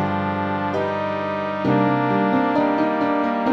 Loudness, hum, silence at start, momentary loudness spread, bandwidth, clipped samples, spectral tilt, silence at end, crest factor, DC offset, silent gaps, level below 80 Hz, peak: -21 LUFS; none; 0 s; 5 LU; 6.6 kHz; under 0.1%; -8.5 dB/octave; 0 s; 14 dB; under 0.1%; none; -58 dBFS; -6 dBFS